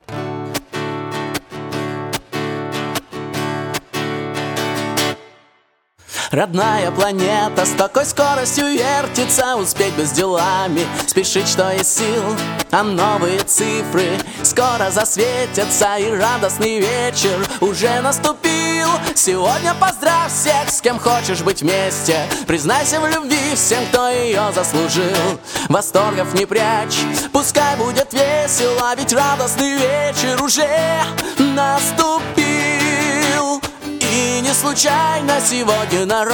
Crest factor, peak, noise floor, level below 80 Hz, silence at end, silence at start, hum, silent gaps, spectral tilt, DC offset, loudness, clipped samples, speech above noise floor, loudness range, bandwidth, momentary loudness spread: 16 dB; 0 dBFS; -59 dBFS; -50 dBFS; 0 s; 0.1 s; none; none; -3 dB/octave; under 0.1%; -16 LUFS; under 0.1%; 42 dB; 6 LU; 17.5 kHz; 9 LU